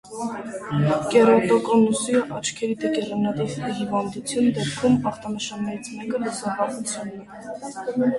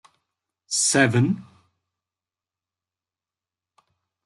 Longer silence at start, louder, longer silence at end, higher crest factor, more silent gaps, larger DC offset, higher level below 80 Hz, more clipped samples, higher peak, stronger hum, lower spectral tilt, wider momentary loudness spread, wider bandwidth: second, 0.05 s vs 0.7 s; about the same, -23 LUFS vs -21 LUFS; second, 0 s vs 2.85 s; about the same, 18 dB vs 22 dB; neither; neither; first, -58 dBFS vs -68 dBFS; neither; about the same, -4 dBFS vs -6 dBFS; neither; first, -5.5 dB/octave vs -4 dB/octave; first, 14 LU vs 9 LU; about the same, 11.5 kHz vs 12 kHz